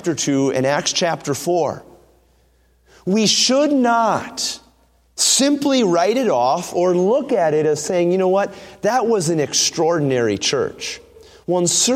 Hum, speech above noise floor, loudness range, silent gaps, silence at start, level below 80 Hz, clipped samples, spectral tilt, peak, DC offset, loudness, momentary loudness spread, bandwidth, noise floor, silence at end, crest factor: none; 39 dB; 3 LU; none; 0 s; -58 dBFS; under 0.1%; -3.5 dB/octave; -2 dBFS; under 0.1%; -17 LUFS; 10 LU; 16 kHz; -57 dBFS; 0 s; 16 dB